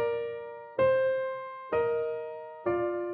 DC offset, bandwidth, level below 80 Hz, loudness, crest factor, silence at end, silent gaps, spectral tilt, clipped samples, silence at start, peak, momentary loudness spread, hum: under 0.1%; 4.6 kHz; -66 dBFS; -31 LUFS; 14 dB; 0 s; none; -9 dB/octave; under 0.1%; 0 s; -16 dBFS; 12 LU; none